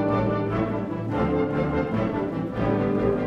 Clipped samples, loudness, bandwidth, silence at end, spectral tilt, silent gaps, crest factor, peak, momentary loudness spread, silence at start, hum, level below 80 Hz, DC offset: under 0.1%; -25 LUFS; 7 kHz; 0 s; -9.5 dB/octave; none; 14 dB; -10 dBFS; 4 LU; 0 s; none; -42 dBFS; under 0.1%